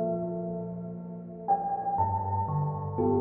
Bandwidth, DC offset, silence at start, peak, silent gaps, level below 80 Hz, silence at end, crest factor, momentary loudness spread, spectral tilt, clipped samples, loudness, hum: 2.4 kHz; under 0.1%; 0 s; -16 dBFS; none; -60 dBFS; 0 s; 14 dB; 10 LU; -14.5 dB/octave; under 0.1%; -31 LUFS; none